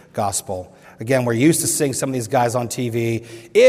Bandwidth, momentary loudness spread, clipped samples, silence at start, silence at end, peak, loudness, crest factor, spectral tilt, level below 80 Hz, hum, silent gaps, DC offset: 16 kHz; 11 LU; under 0.1%; 0.15 s; 0 s; -2 dBFS; -20 LUFS; 18 dB; -4.5 dB/octave; -58 dBFS; none; none; under 0.1%